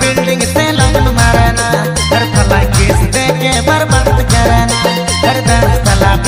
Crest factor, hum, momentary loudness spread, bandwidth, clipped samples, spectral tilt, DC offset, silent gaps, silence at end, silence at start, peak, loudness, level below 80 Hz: 10 dB; none; 3 LU; 16 kHz; 0.5%; -4.5 dB/octave; under 0.1%; none; 0 s; 0 s; 0 dBFS; -10 LUFS; -16 dBFS